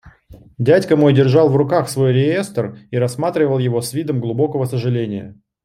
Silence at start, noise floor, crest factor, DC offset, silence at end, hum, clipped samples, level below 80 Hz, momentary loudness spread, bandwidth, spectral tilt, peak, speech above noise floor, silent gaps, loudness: 0.05 s; -44 dBFS; 14 dB; under 0.1%; 0.3 s; none; under 0.1%; -54 dBFS; 10 LU; 14 kHz; -7 dB/octave; -2 dBFS; 28 dB; none; -17 LUFS